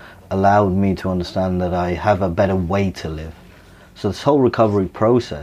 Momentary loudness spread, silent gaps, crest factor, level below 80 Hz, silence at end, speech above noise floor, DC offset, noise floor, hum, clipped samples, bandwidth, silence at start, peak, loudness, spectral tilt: 11 LU; none; 16 dB; -40 dBFS; 0 s; 27 dB; under 0.1%; -44 dBFS; none; under 0.1%; 12.5 kHz; 0 s; -2 dBFS; -18 LUFS; -7.5 dB/octave